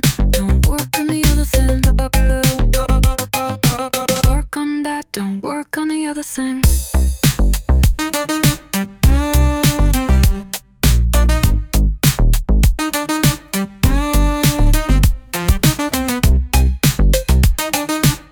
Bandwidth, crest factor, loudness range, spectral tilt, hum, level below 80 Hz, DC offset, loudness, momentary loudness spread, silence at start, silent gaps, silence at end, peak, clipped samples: 19.5 kHz; 14 dB; 3 LU; -5 dB/octave; none; -16 dBFS; under 0.1%; -16 LUFS; 7 LU; 0.05 s; none; 0.1 s; -2 dBFS; under 0.1%